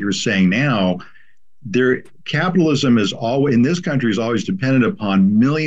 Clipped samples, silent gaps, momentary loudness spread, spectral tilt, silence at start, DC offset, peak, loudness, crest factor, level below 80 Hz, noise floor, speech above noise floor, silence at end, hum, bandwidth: under 0.1%; none; 6 LU; -6 dB/octave; 0 s; 0.9%; -4 dBFS; -17 LUFS; 12 dB; -54 dBFS; -55 dBFS; 38 dB; 0 s; none; 8 kHz